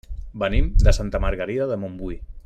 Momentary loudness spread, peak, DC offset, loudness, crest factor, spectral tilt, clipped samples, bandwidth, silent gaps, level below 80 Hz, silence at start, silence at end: 14 LU; -2 dBFS; under 0.1%; -24 LUFS; 20 dB; -6.5 dB/octave; under 0.1%; 9 kHz; none; -22 dBFS; 0.1 s; 0.05 s